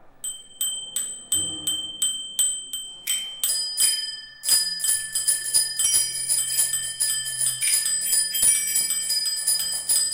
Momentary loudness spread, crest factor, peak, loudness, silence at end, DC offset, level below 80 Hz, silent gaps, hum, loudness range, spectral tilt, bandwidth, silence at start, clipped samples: 9 LU; 20 dB; -4 dBFS; -21 LUFS; 0 s; under 0.1%; -60 dBFS; none; none; 4 LU; 2.5 dB/octave; 17 kHz; 0 s; under 0.1%